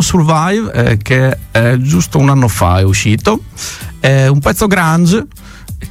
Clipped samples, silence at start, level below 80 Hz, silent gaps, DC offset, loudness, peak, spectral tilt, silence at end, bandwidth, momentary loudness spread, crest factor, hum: under 0.1%; 0 s; -30 dBFS; none; under 0.1%; -11 LUFS; 0 dBFS; -5.5 dB/octave; 0 s; 16 kHz; 11 LU; 10 dB; none